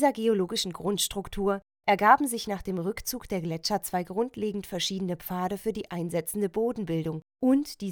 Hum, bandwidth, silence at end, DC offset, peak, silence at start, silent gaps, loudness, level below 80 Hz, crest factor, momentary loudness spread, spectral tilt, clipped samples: none; over 20 kHz; 0 s; under 0.1%; -6 dBFS; 0 s; none; -28 LUFS; -54 dBFS; 22 dB; 9 LU; -4.5 dB/octave; under 0.1%